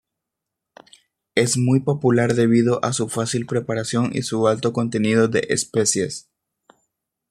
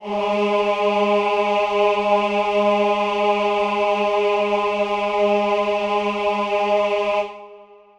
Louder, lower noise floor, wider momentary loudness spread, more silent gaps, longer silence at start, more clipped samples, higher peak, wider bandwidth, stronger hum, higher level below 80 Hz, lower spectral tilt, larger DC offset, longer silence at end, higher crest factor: about the same, -20 LUFS vs -19 LUFS; first, -83 dBFS vs -45 dBFS; first, 6 LU vs 3 LU; neither; first, 1.35 s vs 0 s; neither; first, -2 dBFS vs -6 dBFS; first, 14 kHz vs 9.8 kHz; neither; about the same, -60 dBFS vs -56 dBFS; about the same, -5 dB/octave vs -5 dB/octave; neither; first, 1.1 s vs 0.35 s; first, 20 dB vs 14 dB